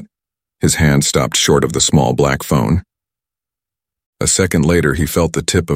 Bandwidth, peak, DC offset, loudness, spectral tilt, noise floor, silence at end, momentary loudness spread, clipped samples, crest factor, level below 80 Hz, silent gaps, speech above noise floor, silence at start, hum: 16.5 kHz; 0 dBFS; under 0.1%; -14 LUFS; -4.5 dB/octave; -88 dBFS; 0 s; 4 LU; under 0.1%; 16 dB; -32 dBFS; 4.06-4.13 s; 74 dB; 0 s; none